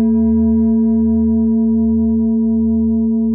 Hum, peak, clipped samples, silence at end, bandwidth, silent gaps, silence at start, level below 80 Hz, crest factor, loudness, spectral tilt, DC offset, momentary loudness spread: none; -6 dBFS; under 0.1%; 0 s; 1.7 kHz; none; 0 s; -34 dBFS; 6 dB; -14 LUFS; -17.5 dB/octave; under 0.1%; 2 LU